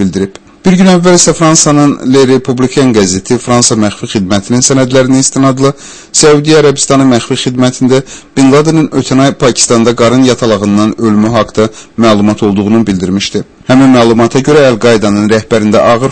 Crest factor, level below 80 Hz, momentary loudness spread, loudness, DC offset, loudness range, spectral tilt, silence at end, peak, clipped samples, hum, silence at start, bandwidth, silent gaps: 8 dB; -38 dBFS; 7 LU; -7 LUFS; under 0.1%; 2 LU; -4.5 dB/octave; 0 s; 0 dBFS; 2%; none; 0 s; 11 kHz; none